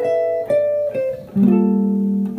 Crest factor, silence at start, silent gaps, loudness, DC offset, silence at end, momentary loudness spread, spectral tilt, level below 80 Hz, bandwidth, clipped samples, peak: 12 dB; 0 s; none; -18 LUFS; under 0.1%; 0 s; 7 LU; -10.5 dB/octave; -56 dBFS; 5.6 kHz; under 0.1%; -4 dBFS